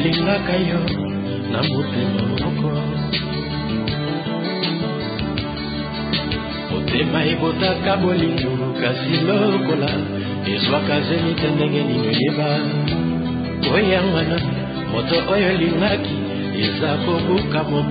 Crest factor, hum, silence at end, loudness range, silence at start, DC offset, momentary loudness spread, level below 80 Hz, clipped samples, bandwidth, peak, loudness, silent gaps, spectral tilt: 14 dB; none; 0 s; 4 LU; 0 s; under 0.1%; 6 LU; -38 dBFS; under 0.1%; 5 kHz; -6 dBFS; -20 LUFS; none; -11.5 dB/octave